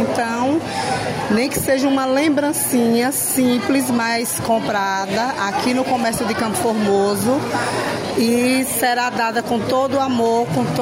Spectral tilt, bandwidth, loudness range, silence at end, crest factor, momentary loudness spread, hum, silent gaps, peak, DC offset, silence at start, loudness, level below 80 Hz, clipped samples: -4 dB/octave; 16.5 kHz; 2 LU; 0 s; 12 dB; 4 LU; none; none; -6 dBFS; under 0.1%; 0 s; -18 LUFS; -52 dBFS; under 0.1%